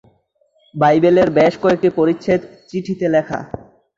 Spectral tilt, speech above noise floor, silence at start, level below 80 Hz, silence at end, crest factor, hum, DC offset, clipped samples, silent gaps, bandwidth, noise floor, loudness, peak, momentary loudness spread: -7.5 dB/octave; 45 dB; 0.75 s; -52 dBFS; 0.5 s; 14 dB; none; under 0.1%; under 0.1%; none; 7.6 kHz; -60 dBFS; -16 LUFS; -2 dBFS; 15 LU